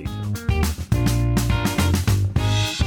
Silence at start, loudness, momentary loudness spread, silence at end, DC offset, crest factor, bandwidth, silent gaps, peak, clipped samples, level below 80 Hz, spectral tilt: 0 s; -21 LUFS; 4 LU; 0 s; under 0.1%; 12 dB; 18.5 kHz; none; -8 dBFS; under 0.1%; -28 dBFS; -5.5 dB/octave